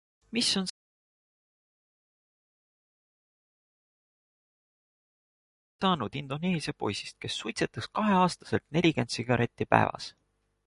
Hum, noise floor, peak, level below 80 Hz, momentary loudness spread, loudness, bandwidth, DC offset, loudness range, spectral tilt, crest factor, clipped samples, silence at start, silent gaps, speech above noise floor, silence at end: none; under -90 dBFS; -4 dBFS; -62 dBFS; 10 LU; -29 LUFS; 11.5 kHz; under 0.1%; 9 LU; -5 dB/octave; 28 dB; under 0.1%; 0.3 s; 0.70-5.79 s; over 61 dB; 0.6 s